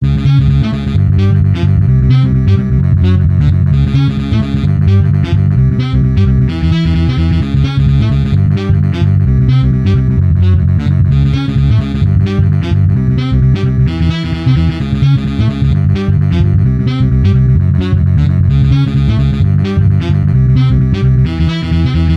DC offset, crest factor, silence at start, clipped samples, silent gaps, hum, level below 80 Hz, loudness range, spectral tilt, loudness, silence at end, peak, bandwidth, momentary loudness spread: under 0.1%; 8 dB; 0 s; under 0.1%; none; none; -18 dBFS; 1 LU; -9 dB/octave; -11 LUFS; 0 s; 0 dBFS; 6.2 kHz; 3 LU